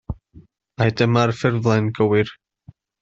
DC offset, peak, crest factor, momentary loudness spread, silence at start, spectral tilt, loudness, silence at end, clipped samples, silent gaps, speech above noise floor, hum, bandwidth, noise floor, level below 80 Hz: under 0.1%; -4 dBFS; 18 dB; 11 LU; 0.1 s; -7 dB/octave; -19 LUFS; 0.7 s; under 0.1%; none; 31 dB; none; 7.6 kHz; -49 dBFS; -46 dBFS